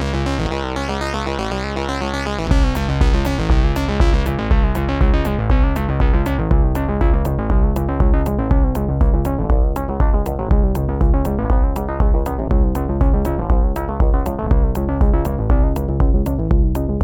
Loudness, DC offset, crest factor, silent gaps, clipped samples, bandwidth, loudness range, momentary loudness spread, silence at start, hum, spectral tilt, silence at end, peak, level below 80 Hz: -18 LUFS; under 0.1%; 14 dB; none; under 0.1%; 15.5 kHz; 1 LU; 4 LU; 0 s; none; -7.5 dB/octave; 0 s; -2 dBFS; -18 dBFS